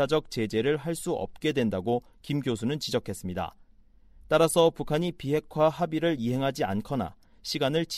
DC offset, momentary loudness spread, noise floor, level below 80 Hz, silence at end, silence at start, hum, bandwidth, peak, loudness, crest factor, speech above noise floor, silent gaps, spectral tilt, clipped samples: under 0.1%; 10 LU; -56 dBFS; -54 dBFS; 0 s; 0 s; none; 15.5 kHz; -8 dBFS; -28 LUFS; 20 dB; 29 dB; none; -5.5 dB/octave; under 0.1%